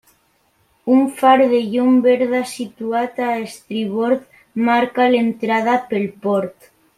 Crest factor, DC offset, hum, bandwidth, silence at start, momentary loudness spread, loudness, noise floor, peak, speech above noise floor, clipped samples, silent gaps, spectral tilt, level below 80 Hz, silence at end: 16 dB; under 0.1%; none; 14 kHz; 0.85 s; 12 LU; -17 LUFS; -61 dBFS; -2 dBFS; 44 dB; under 0.1%; none; -5.5 dB/octave; -64 dBFS; 0.45 s